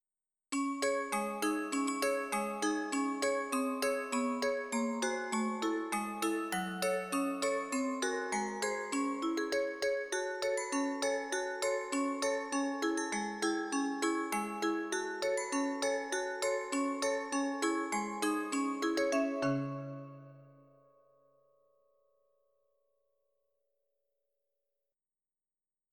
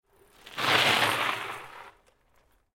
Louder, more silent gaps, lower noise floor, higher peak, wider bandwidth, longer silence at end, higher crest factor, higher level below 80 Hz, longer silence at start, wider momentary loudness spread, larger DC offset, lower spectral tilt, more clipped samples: second, -34 LUFS vs -24 LUFS; neither; first, under -90 dBFS vs -66 dBFS; second, -18 dBFS vs -6 dBFS; about the same, 18 kHz vs 16.5 kHz; first, 5.4 s vs 0.9 s; second, 16 dB vs 24 dB; second, -76 dBFS vs -66 dBFS; about the same, 0.5 s vs 0.45 s; second, 3 LU vs 20 LU; neither; first, -3.5 dB/octave vs -2 dB/octave; neither